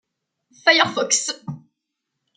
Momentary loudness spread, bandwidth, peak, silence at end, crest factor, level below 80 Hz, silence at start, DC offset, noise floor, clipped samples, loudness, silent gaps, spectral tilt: 20 LU; 11 kHz; -2 dBFS; 0.8 s; 22 dB; -70 dBFS; 0.65 s; under 0.1%; -80 dBFS; under 0.1%; -18 LUFS; none; -1 dB/octave